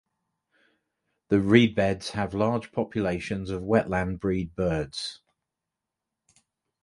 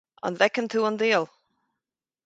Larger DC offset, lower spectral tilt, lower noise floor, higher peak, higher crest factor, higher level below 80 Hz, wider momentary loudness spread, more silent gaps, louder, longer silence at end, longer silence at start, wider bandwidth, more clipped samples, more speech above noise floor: neither; first, -6.5 dB/octave vs -4 dB/octave; about the same, -86 dBFS vs -88 dBFS; first, -2 dBFS vs -6 dBFS; about the same, 24 dB vs 22 dB; first, -48 dBFS vs -76 dBFS; first, 12 LU vs 9 LU; neither; about the same, -26 LUFS vs -24 LUFS; first, 1.65 s vs 1 s; first, 1.3 s vs 0.25 s; first, 11.5 kHz vs 9 kHz; neither; about the same, 61 dB vs 64 dB